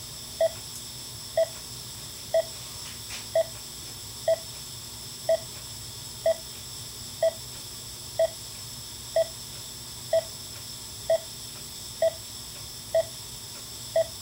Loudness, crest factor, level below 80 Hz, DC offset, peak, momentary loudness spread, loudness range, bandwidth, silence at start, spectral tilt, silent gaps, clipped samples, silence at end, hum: -31 LUFS; 18 dB; -56 dBFS; under 0.1%; -14 dBFS; 9 LU; 1 LU; 16 kHz; 0 s; -2.5 dB/octave; none; under 0.1%; 0 s; none